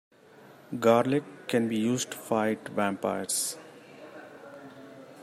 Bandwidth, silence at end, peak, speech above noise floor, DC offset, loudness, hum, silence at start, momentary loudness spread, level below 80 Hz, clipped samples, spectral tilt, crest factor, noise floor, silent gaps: 15.5 kHz; 0 s; -8 dBFS; 26 dB; under 0.1%; -28 LUFS; none; 0.7 s; 23 LU; -74 dBFS; under 0.1%; -4 dB/octave; 22 dB; -53 dBFS; none